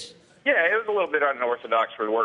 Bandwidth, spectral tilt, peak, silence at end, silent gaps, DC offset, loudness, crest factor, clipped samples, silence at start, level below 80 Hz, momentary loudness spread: 10.5 kHz; -3.5 dB/octave; -8 dBFS; 0 s; none; under 0.1%; -23 LUFS; 16 dB; under 0.1%; 0 s; -78 dBFS; 7 LU